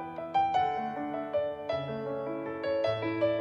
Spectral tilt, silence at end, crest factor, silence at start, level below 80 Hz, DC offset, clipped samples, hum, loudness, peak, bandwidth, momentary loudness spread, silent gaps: -7 dB/octave; 0 s; 14 dB; 0 s; -66 dBFS; under 0.1%; under 0.1%; none; -32 LUFS; -16 dBFS; 7.6 kHz; 7 LU; none